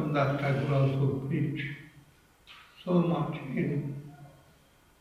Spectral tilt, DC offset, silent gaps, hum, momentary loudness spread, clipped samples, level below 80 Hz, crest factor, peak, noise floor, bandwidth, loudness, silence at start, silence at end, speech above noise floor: -8.5 dB/octave; under 0.1%; none; none; 16 LU; under 0.1%; -60 dBFS; 18 dB; -14 dBFS; -61 dBFS; 6.6 kHz; -30 LUFS; 0 s; 0.7 s; 33 dB